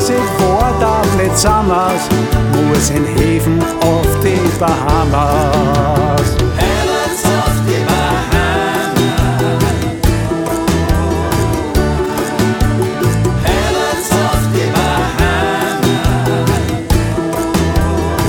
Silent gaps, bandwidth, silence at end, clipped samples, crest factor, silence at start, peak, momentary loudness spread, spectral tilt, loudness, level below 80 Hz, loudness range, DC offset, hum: none; 19.5 kHz; 0 s; under 0.1%; 12 dB; 0 s; 0 dBFS; 3 LU; -5.5 dB/octave; -13 LUFS; -22 dBFS; 2 LU; under 0.1%; none